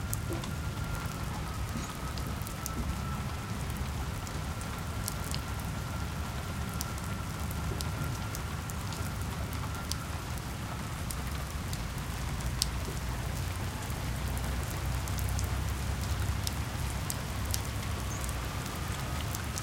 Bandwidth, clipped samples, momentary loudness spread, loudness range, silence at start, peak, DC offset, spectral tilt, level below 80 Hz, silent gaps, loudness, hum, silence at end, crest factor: 17 kHz; under 0.1%; 4 LU; 2 LU; 0 s; -4 dBFS; under 0.1%; -4.5 dB/octave; -40 dBFS; none; -36 LUFS; none; 0 s; 30 dB